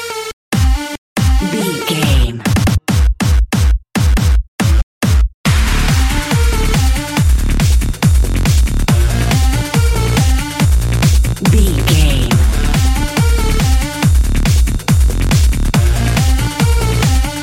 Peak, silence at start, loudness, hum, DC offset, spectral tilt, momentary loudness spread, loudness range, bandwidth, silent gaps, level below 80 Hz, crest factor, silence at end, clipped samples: 0 dBFS; 0 s; -14 LUFS; none; under 0.1%; -5 dB/octave; 3 LU; 1 LU; 16.5 kHz; 0.33-0.52 s, 0.98-1.16 s, 4.48-4.59 s, 4.83-5.01 s, 5.34-5.44 s; -14 dBFS; 12 dB; 0 s; under 0.1%